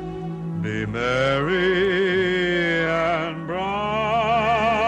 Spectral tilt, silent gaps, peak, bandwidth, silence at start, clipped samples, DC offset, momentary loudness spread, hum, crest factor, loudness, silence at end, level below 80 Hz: -6 dB/octave; none; -8 dBFS; 9.2 kHz; 0 s; under 0.1%; under 0.1%; 8 LU; none; 14 dB; -22 LUFS; 0 s; -44 dBFS